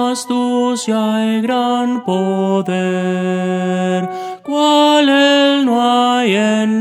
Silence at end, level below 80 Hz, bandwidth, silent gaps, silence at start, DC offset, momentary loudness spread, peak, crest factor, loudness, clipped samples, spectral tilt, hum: 0 s; -68 dBFS; 14 kHz; none; 0 s; under 0.1%; 7 LU; 0 dBFS; 14 dB; -14 LUFS; under 0.1%; -5 dB/octave; none